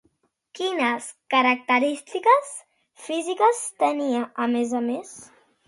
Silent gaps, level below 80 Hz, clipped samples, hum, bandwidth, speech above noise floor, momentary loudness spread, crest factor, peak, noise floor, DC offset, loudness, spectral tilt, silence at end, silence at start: none; -76 dBFS; under 0.1%; none; 11.5 kHz; 45 dB; 15 LU; 18 dB; -6 dBFS; -68 dBFS; under 0.1%; -23 LUFS; -2.5 dB/octave; 0.4 s; 0.55 s